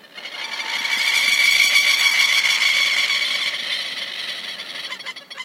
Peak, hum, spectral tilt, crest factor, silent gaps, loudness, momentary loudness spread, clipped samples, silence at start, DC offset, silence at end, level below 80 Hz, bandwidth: -2 dBFS; none; 3 dB/octave; 18 dB; none; -16 LUFS; 15 LU; under 0.1%; 0.05 s; under 0.1%; 0 s; -88 dBFS; 16 kHz